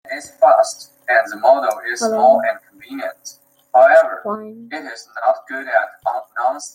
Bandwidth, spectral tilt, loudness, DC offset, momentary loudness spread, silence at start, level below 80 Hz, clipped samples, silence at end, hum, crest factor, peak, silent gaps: 16 kHz; -2.5 dB/octave; -16 LUFS; under 0.1%; 17 LU; 0.05 s; -72 dBFS; under 0.1%; 0.05 s; none; 16 dB; 0 dBFS; none